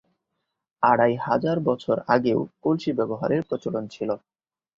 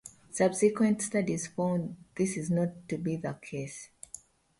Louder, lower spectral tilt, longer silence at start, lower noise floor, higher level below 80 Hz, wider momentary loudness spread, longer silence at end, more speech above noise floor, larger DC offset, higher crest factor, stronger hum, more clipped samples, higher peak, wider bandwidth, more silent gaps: first, -24 LUFS vs -31 LUFS; first, -8 dB/octave vs -6 dB/octave; first, 0.8 s vs 0.05 s; first, -80 dBFS vs -52 dBFS; about the same, -64 dBFS vs -66 dBFS; second, 9 LU vs 19 LU; first, 0.6 s vs 0.45 s; first, 57 dB vs 22 dB; neither; about the same, 20 dB vs 18 dB; neither; neither; first, -4 dBFS vs -12 dBFS; second, 7.6 kHz vs 11.5 kHz; neither